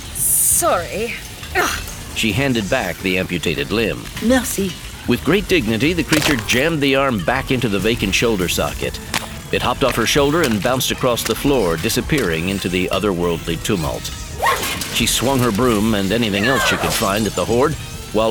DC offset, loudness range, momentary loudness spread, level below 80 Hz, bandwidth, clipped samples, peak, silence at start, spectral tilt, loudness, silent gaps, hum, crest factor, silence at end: under 0.1%; 3 LU; 7 LU; -34 dBFS; over 20 kHz; under 0.1%; -2 dBFS; 0 s; -3.5 dB/octave; -18 LUFS; none; none; 16 dB; 0 s